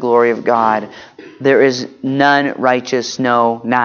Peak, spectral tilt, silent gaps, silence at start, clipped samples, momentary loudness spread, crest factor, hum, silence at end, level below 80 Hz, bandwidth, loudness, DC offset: 0 dBFS; -5 dB/octave; none; 0 s; under 0.1%; 8 LU; 14 dB; none; 0 s; -64 dBFS; 7.2 kHz; -14 LUFS; under 0.1%